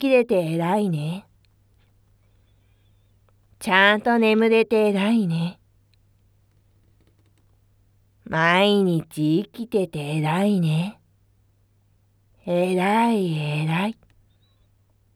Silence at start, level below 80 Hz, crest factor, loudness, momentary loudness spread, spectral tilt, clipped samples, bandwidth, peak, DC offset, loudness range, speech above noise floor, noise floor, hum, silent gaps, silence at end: 0 s; -64 dBFS; 22 dB; -21 LUFS; 11 LU; -6.5 dB/octave; under 0.1%; 14.5 kHz; -2 dBFS; under 0.1%; 8 LU; 41 dB; -61 dBFS; none; none; 1.25 s